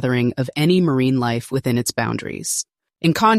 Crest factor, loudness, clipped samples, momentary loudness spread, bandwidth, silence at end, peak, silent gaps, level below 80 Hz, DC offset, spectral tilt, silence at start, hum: 16 dB; -20 LUFS; under 0.1%; 7 LU; 15.5 kHz; 0 s; -2 dBFS; none; -54 dBFS; under 0.1%; -5 dB/octave; 0 s; none